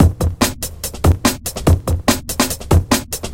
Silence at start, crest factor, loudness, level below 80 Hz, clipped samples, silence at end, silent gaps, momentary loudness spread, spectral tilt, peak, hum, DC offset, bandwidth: 0 s; 16 dB; -17 LUFS; -24 dBFS; under 0.1%; 0 s; none; 4 LU; -4.5 dB/octave; 0 dBFS; none; under 0.1%; 17 kHz